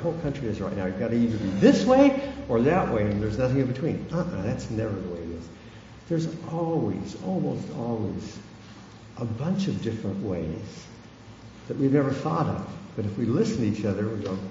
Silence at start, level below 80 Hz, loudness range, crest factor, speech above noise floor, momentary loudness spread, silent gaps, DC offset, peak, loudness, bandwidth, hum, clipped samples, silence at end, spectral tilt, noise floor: 0 s; -48 dBFS; 9 LU; 22 dB; 21 dB; 22 LU; none; under 0.1%; -4 dBFS; -26 LUFS; 7.8 kHz; none; under 0.1%; 0 s; -7.5 dB/octave; -46 dBFS